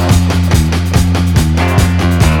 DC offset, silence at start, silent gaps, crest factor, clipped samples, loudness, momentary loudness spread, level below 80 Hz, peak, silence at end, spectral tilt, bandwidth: under 0.1%; 0 s; none; 10 dB; 0.2%; -11 LUFS; 1 LU; -18 dBFS; 0 dBFS; 0 s; -6 dB/octave; 17.5 kHz